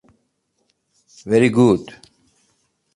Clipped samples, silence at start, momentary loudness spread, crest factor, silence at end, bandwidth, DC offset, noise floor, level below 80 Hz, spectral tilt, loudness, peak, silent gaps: under 0.1%; 1.25 s; 25 LU; 18 dB; 1.1 s; 11 kHz; under 0.1%; -69 dBFS; -56 dBFS; -7 dB/octave; -16 LUFS; -2 dBFS; none